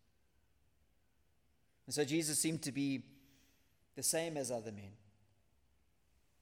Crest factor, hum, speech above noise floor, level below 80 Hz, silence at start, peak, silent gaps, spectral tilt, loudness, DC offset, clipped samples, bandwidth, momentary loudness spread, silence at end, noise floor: 22 dB; none; 39 dB; -80 dBFS; 1.85 s; -22 dBFS; none; -3.5 dB/octave; -37 LUFS; under 0.1%; under 0.1%; 16.5 kHz; 17 LU; 1.45 s; -77 dBFS